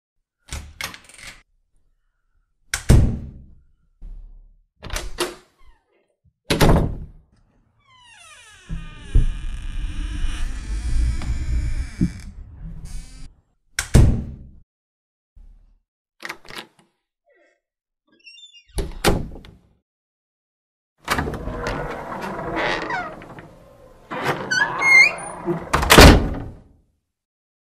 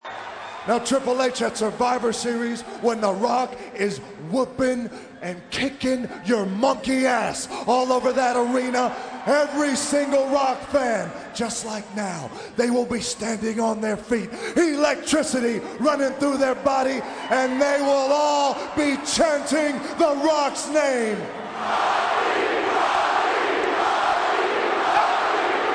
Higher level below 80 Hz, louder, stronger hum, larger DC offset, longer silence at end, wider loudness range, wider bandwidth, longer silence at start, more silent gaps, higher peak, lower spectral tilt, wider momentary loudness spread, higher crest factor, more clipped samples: first, -26 dBFS vs -56 dBFS; first, -19 LUFS vs -22 LUFS; neither; neither; first, 1.1 s vs 0 s; first, 18 LU vs 4 LU; first, 15.5 kHz vs 10.5 kHz; first, 0.5 s vs 0.05 s; first, 14.63-15.36 s, 15.88-16.05 s, 19.82-20.96 s vs none; first, 0 dBFS vs -6 dBFS; about the same, -4.5 dB/octave vs -3.5 dB/octave; first, 26 LU vs 8 LU; first, 22 dB vs 16 dB; neither